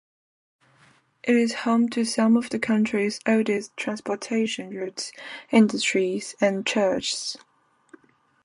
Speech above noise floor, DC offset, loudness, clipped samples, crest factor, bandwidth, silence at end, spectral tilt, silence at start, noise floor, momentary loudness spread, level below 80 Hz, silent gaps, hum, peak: 36 dB; under 0.1%; -24 LUFS; under 0.1%; 20 dB; 11 kHz; 1.1 s; -4 dB/octave; 1.25 s; -59 dBFS; 12 LU; -68 dBFS; none; none; -6 dBFS